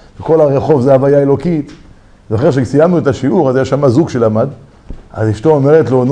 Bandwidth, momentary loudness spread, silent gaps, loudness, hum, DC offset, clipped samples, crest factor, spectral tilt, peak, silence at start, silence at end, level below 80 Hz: 9.6 kHz; 9 LU; none; -11 LUFS; none; under 0.1%; 0.3%; 12 dB; -8.5 dB/octave; 0 dBFS; 0.2 s; 0 s; -38 dBFS